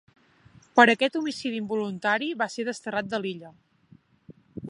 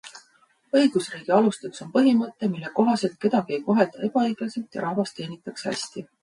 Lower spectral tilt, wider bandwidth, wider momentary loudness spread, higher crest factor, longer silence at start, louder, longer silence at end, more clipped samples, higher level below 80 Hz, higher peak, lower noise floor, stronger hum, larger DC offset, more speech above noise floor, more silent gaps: about the same, -4.5 dB/octave vs -5.5 dB/octave; about the same, 11 kHz vs 11.5 kHz; about the same, 13 LU vs 11 LU; first, 26 dB vs 20 dB; first, 0.75 s vs 0.05 s; about the same, -25 LUFS vs -24 LUFS; second, 0 s vs 0.2 s; neither; about the same, -70 dBFS vs -72 dBFS; about the same, -2 dBFS vs -4 dBFS; second, -58 dBFS vs -62 dBFS; neither; neither; second, 33 dB vs 38 dB; neither